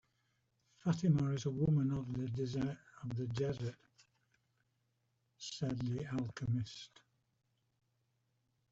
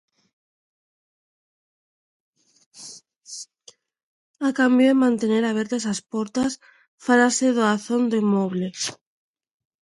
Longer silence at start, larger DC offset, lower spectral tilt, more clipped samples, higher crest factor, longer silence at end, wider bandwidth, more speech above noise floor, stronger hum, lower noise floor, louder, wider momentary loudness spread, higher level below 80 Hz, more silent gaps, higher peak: second, 0.85 s vs 2.75 s; neither; first, -7 dB/octave vs -4.5 dB/octave; neither; about the same, 18 dB vs 20 dB; first, 1.85 s vs 0.9 s; second, 7.8 kHz vs 11.5 kHz; first, 44 dB vs 33 dB; neither; first, -81 dBFS vs -54 dBFS; second, -38 LUFS vs -21 LUFS; second, 14 LU vs 21 LU; about the same, -66 dBFS vs -68 dBFS; second, none vs 4.03-4.34 s, 6.88-6.98 s; second, -22 dBFS vs -4 dBFS